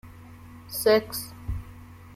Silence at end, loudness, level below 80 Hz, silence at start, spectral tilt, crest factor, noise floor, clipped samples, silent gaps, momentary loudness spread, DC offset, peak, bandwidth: 0 s; -27 LUFS; -44 dBFS; 0.05 s; -4 dB/octave; 20 dB; -46 dBFS; under 0.1%; none; 25 LU; under 0.1%; -8 dBFS; 16.5 kHz